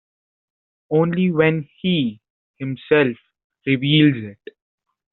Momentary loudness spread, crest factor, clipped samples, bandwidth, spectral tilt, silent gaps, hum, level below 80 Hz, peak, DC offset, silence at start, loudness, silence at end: 15 LU; 18 dB; under 0.1%; 4.2 kHz; -5 dB/octave; 2.30-2.54 s, 3.44-3.50 s; none; -60 dBFS; -2 dBFS; under 0.1%; 0.9 s; -19 LUFS; 0.8 s